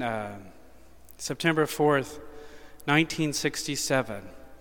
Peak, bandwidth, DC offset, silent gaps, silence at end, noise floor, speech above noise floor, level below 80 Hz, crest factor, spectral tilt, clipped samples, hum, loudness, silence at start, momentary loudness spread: -6 dBFS; 19 kHz; 0.3%; none; 0 s; -54 dBFS; 26 dB; -54 dBFS; 22 dB; -4 dB/octave; under 0.1%; none; -27 LUFS; 0 s; 19 LU